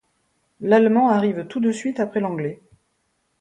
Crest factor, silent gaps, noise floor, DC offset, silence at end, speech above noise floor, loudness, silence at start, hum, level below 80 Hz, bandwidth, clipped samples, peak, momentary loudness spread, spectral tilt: 20 dB; none; -70 dBFS; under 0.1%; 0.85 s; 51 dB; -20 LUFS; 0.6 s; none; -66 dBFS; 9.4 kHz; under 0.1%; -2 dBFS; 12 LU; -7 dB/octave